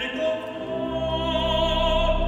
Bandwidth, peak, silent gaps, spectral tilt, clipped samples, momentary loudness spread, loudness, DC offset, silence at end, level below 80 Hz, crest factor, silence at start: 8.2 kHz; -10 dBFS; none; -5.5 dB/octave; under 0.1%; 8 LU; -24 LUFS; under 0.1%; 0 s; -30 dBFS; 14 dB; 0 s